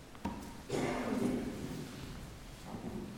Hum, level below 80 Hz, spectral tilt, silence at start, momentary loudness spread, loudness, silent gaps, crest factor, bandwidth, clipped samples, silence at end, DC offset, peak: none; -54 dBFS; -5.5 dB/octave; 0 s; 13 LU; -40 LUFS; none; 18 dB; 18.5 kHz; under 0.1%; 0 s; under 0.1%; -22 dBFS